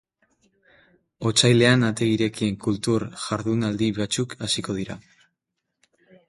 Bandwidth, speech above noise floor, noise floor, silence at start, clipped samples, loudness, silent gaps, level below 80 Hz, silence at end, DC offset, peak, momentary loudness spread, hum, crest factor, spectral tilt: 11.5 kHz; 58 dB; -80 dBFS; 1.2 s; under 0.1%; -22 LUFS; none; -56 dBFS; 1.3 s; under 0.1%; -2 dBFS; 12 LU; none; 22 dB; -4.5 dB/octave